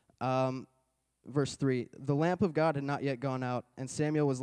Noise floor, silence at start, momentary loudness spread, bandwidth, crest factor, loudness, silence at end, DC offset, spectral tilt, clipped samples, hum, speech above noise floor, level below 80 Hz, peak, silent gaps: -77 dBFS; 0.2 s; 8 LU; 10.5 kHz; 16 dB; -33 LUFS; 0 s; under 0.1%; -6.5 dB/octave; under 0.1%; none; 45 dB; -68 dBFS; -16 dBFS; none